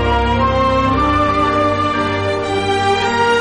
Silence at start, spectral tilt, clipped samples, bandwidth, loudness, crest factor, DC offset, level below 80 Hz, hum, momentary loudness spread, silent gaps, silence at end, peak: 0 s; -5.5 dB/octave; under 0.1%; 10.5 kHz; -15 LUFS; 12 dB; under 0.1%; -28 dBFS; none; 3 LU; none; 0 s; -4 dBFS